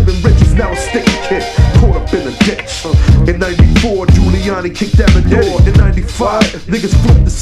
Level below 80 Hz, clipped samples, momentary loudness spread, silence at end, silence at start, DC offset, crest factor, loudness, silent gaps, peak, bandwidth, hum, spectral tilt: -12 dBFS; 1%; 6 LU; 0 s; 0 s; under 0.1%; 10 dB; -11 LUFS; none; 0 dBFS; 12 kHz; none; -6.5 dB/octave